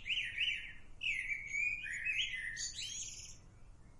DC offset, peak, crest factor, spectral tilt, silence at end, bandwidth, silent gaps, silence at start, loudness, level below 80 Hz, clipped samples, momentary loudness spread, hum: under 0.1%; -26 dBFS; 16 dB; 1 dB/octave; 0 s; 11.5 kHz; none; 0 s; -37 LUFS; -58 dBFS; under 0.1%; 10 LU; none